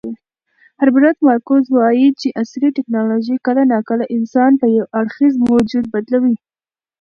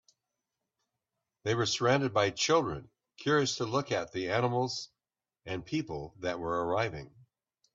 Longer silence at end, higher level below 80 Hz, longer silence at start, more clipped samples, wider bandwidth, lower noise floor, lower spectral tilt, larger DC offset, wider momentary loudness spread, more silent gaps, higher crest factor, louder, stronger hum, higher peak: about the same, 0.65 s vs 0.65 s; first, -56 dBFS vs -64 dBFS; second, 0.05 s vs 1.45 s; neither; second, 6.8 kHz vs 8 kHz; about the same, under -90 dBFS vs under -90 dBFS; first, -7 dB/octave vs -4.5 dB/octave; neither; second, 8 LU vs 13 LU; neither; second, 14 dB vs 20 dB; first, -15 LUFS vs -31 LUFS; neither; first, 0 dBFS vs -12 dBFS